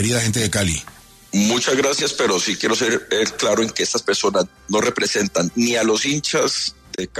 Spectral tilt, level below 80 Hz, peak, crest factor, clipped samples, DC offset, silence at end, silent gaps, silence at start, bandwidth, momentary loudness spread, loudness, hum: -3 dB/octave; -50 dBFS; -6 dBFS; 14 dB; under 0.1%; under 0.1%; 0 s; none; 0 s; 14 kHz; 5 LU; -19 LUFS; none